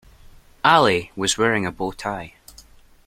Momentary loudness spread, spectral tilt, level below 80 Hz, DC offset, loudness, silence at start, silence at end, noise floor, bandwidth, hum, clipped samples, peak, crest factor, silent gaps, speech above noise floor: 14 LU; -3.5 dB/octave; -50 dBFS; under 0.1%; -20 LUFS; 0.65 s; 0.8 s; -49 dBFS; 16.5 kHz; none; under 0.1%; -2 dBFS; 20 dB; none; 29 dB